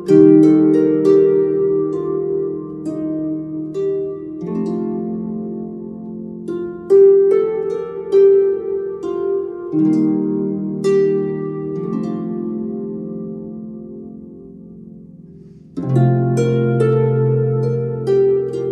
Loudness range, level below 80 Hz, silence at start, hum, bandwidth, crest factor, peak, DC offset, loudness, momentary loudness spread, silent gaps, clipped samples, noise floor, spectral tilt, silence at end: 10 LU; -54 dBFS; 0 s; none; 8.6 kHz; 16 dB; 0 dBFS; under 0.1%; -17 LUFS; 18 LU; none; under 0.1%; -40 dBFS; -10 dB/octave; 0 s